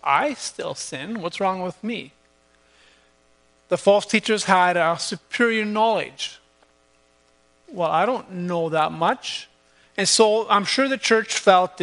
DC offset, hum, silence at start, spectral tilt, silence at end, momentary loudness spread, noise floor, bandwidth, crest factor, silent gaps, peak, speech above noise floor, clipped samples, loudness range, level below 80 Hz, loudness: under 0.1%; none; 0.05 s; -3 dB/octave; 0 s; 13 LU; -60 dBFS; 10.5 kHz; 22 dB; none; 0 dBFS; 39 dB; under 0.1%; 6 LU; -70 dBFS; -21 LUFS